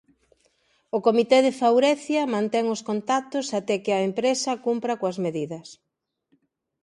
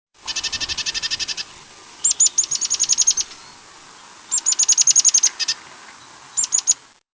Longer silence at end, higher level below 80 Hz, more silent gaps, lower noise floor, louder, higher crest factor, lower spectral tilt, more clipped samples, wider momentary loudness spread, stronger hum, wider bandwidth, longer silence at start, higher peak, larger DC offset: first, 1.1 s vs 0.45 s; second, -74 dBFS vs -56 dBFS; neither; first, -69 dBFS vs -44 dBFS; second, -23 LUFS vs -16 LUFS; about the same, 18 dB vs 18 dB; first, -4.5 dB/octave vs 3 dB/octave; neither; second, 9 LU vs 14 LU; neither; first, 11.5 kHz vs 8 kHz; first, 0.95 s vs 0.25 s; second, -6 dBFS vs -2 dBFS; neither